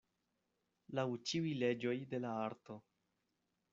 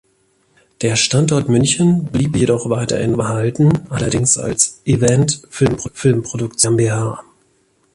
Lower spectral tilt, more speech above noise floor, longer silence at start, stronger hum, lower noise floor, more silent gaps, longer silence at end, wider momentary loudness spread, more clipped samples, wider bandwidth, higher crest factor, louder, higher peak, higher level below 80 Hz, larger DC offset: about the same, -5 dB/octave vs -5 dB/octave; about the same, 45 dB vs 44 dB; about the same, 0.9 s vs 0.8 s; neither; first, -86 dBFS vs -59 dBFS; neither; first, 0.9 s vs 0.75 s; first, 15 LU vs 5 LU; neither; second, 7.6 kHz vs 11.5 kHz; about the same, 20 dB vs 16 dB; second, -40 LUFS vs -16 LUFS; second, -24 dBFS vs 0 dBFS; second, -82 dBFS vs -42 dBFS; neither